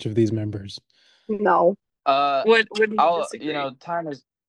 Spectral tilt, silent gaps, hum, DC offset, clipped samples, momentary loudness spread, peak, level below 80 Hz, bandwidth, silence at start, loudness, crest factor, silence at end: -6 dB/octave; none; none; under 0.1%; under 0.1%; 14 LU; -4 dBFS; -64 dBFS; 10.5 kHz; 0 s; -22 LUFS; 18 dB; 0.3 s